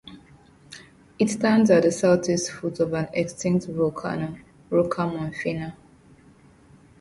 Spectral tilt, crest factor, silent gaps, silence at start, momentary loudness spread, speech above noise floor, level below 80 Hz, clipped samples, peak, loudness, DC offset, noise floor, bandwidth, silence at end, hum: -6 dB/octave; 20 dB; none; 0.05 s; 19 LU; 31 dB; -58 dBFS; under 0.1%; -6 dBFS; -23 LUFS; under 0.1%; -53 dBFS; 11.5 kHz; 1.3 s; none